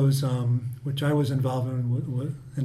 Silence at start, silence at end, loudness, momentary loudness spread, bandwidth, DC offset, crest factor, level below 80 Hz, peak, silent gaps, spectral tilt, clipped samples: 0 s; 0 s; -27 LUFS; 7 LU; 14 kHz; under 0.1%; 12 dB; -60 dBFS; -12 dBFS; none; -7.5 dB/octave; under 0.1%